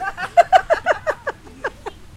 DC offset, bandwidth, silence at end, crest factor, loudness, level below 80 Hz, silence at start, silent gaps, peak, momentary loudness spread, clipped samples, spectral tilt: under 0.1%; 13.5 kHz; 0.1 s; 20 dB; -17 LUFS; -46 dBFS; 0 s; none; 0 dBFS; 16 LU; under 0.1%; -3 dB/octave